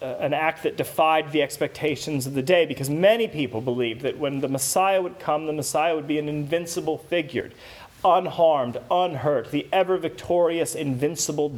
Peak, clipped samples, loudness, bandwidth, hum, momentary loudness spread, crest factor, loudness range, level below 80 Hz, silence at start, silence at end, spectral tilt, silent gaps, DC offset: -4 dBFS; under 0.1%; -24 LUFS; 19.5 kHz; none; 7 LU; 18 dB; 2 LU; -60 dBFS; 0 s; 0 s; -4.5 dB/octave; none; under 0.1%